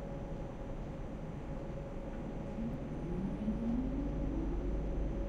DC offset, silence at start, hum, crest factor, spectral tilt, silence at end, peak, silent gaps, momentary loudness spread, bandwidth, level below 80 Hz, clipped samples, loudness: under 0.1%; 0 s; none; 14 dB; -9 dB/octave; 0 s; -24 dBFS; none; 8 LU; 7.6 kHz; -42 dBFS; under 0.1%; -40 LUFS